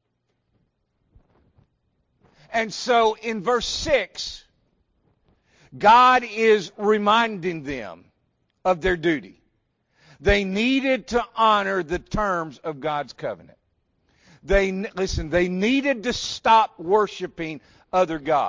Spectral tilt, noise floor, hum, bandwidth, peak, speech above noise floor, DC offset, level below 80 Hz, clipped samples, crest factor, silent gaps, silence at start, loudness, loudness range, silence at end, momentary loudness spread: -4.5 dB/octave; -73 dBFS; none; 7.6 kHz; -6 dBFS; 52 dB; under 0.1%; -42 dBFS; under 0.1%; 18 dB; none; 2.5 s; -22 LUFS; 7 LU; 0 s; 14 LU